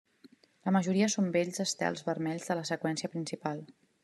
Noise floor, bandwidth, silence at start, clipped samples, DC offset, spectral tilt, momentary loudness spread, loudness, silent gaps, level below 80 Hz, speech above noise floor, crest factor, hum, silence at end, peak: -61 dBFS; 12.5 kHz; 0.65 s; under 0.1%; under 0.1%; -4.5 dB/octave; 9 LU; -32 LUFS; none; -78 dBFS; 30 dB; 18 dB; none; 0.3 s; -14 dBFS